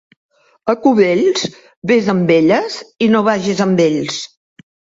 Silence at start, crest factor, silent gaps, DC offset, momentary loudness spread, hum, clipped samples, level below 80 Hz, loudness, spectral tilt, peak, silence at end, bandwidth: 0.65 s; 14 dB; 1.77-1.82 s; under 0.1%; 13 LU; none; under 0.1%; -58 dBFS; -15 LUFS; -5.5 dB/octave; 0 dBFS; 0.7 s; 7.8 kHz